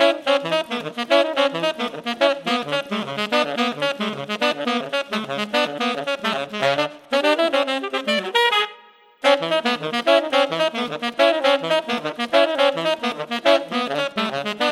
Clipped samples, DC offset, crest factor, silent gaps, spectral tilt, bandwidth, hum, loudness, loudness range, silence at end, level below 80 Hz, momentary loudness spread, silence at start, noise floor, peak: under 0.1%; under 0.1%; 20 dB; none; -3.5 dB/octave; 14 kHz; none; -21 LUFS; 3 LU; 0 s; -70 dBFS; 7 LU; 0 s; -49 dBFS; 0 dBFS